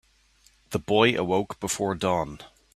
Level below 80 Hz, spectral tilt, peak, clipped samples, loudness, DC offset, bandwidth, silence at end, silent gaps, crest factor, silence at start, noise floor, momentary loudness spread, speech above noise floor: -56 dBFS; -4 dB/octave; -4 dBFS; under 0.1%; -25 LUFS; under 0.1%; 15 kHz; 0.3 s; none; 22 dB; 0.7 s; -61 dBFS; 13 LU; 36 dB